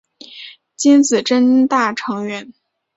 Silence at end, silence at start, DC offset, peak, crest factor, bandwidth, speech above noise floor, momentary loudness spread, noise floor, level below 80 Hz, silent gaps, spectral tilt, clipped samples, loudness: 0.45 s; 0.3 s; under 0.1%; -2 dBFS; 14 dB; 8 kHz; 24 dB; 22 LU; -38 dBFS; -64 dBFS; none; -3.5 dB/octave; under 0.1%; -15 LUFS